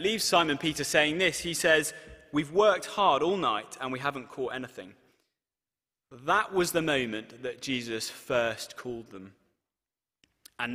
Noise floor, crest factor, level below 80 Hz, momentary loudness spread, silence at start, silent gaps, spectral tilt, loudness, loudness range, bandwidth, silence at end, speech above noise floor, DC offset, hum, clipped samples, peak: under -90 dBFS; 20 dB; -62 dBFS; 15 LU; 0 s; none; -3 dB/octave; -28 LUFS; 9 LU; 15.5 kHz; 0 s; over 61 dB; under 0.1%; none; under 0.1%; -10 dBFS